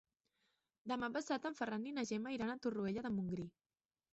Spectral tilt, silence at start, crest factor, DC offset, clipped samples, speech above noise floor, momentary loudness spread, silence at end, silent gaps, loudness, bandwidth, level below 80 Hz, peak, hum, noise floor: -5 dB/octave; 0.85 s; 16 dB; under 0.1%; under 0.1%; 43 dB; 4 LU; 0.65 s; none; -42 LUFS; 8 kHz; -74 dBFS; -28 dBFS; none; -84 dBFS